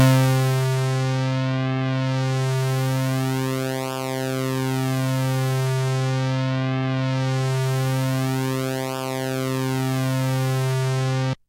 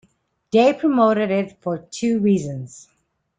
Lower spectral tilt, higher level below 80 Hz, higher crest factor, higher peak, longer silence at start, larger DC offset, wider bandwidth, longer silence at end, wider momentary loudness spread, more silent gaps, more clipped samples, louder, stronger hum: about the same, -6 dB/octave vs -6.5 dB/octave; about the same, -58 dBFS vs -62 dBFS; about the same, 16 dB vs 16 dB; about the same, -6 dBFS vs -4 dBFS; second, 0 s vs 0.55 s; neither; first, 16 kHz vs 9.4 kHz; second, 0.15 s vs 0.6 s; second, 4 LU vs 13 LU; neither; neither; second, -23 LUFS vs -19 LUFS; neither